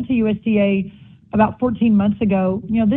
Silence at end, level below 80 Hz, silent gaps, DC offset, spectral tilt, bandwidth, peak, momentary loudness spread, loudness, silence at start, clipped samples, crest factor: 0 s; -46 dBFS; none; under 0.1%; -11.5 dB/octave; 3.8 kHz; -2 dBFS; 6 LU; -18 LUFS; 0 s; under 0.1%; 16 dB